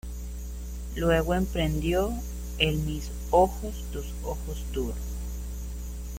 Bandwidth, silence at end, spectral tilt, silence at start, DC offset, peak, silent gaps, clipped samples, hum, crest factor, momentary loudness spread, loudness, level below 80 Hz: 16.5 kHz; 0 s; -5.5 dB/octave; 0.05 s; under 0.1%; -8 dBFS; none; under 0.1%; 60 Hz at -35 dBFS; 22 dB; 14 LU; -29 LUFS; -34 dBFS